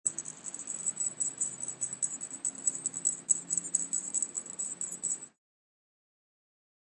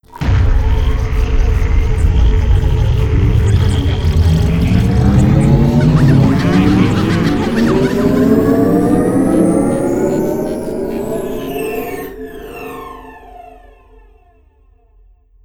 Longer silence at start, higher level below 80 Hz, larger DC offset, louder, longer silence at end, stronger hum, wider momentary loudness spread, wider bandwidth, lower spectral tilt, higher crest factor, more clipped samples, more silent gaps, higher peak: about the same, 0.05 s vs 0.15 s; second, -86 dBFS vs -18 dBFS; neither; second, -32 LUFS vs -13 LUFS; second, 1.55 s vs 1.95 s; neither; second, 8 LU vs 11 LU; second, 11.5 kHz vs 17.5 kHz; second, -0.5 dB/octave vs -8 dB/octave; first, 26 dB vs 12 dB; neither; neither; second, -10 dBFS vs 0 dBFS